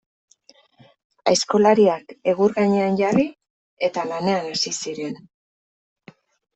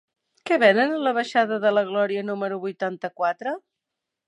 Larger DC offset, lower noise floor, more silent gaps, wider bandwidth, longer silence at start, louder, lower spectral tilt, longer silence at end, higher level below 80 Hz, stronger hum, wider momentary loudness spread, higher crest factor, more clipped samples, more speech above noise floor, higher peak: neither; second, -55 dBFS vs -84 dBFS; first, 3.50-3.77 s vs none; second, 8.4 kHz vs 10.5 kHz; first, 1.25 s vs 0.45 s; first, -20 LUFS vs -23 LUFS; about the same, -4.5 dB/octave vs -5.5 dB/octave; first, 1.4 s vs 0.7 s; first, -62 dBFS vs -82 dBFS; neither; about the same, 11 LU vs 12 LU; about the same, 20 dB vs 20 dB; neither; second, 36 dB vs 62 dB; about the same, -4 dBFS vs -4 dBFS